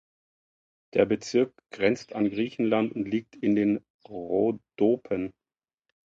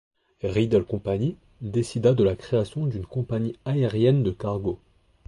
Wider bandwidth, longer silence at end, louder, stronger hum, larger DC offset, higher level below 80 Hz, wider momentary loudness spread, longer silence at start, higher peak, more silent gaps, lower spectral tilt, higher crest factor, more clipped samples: second, 7.8 kHz vs 11.5 kHz; first, 0.75 s vs 0.5 s; about the same, -27 LUFS vs -25 LUFS; neither; neither; second, -64 dBFS vs -48 dBFS; about the same, 7 LU vs 9 LU; first, 0.95 s vs 0.45 s; about the same, -6 dBFS vs -8 dBFS; first, 3.90-3.99 s vs none; second, -6.5 dB/octave vs -8 dB/octave; first, 22 dB vs 16 dB; neither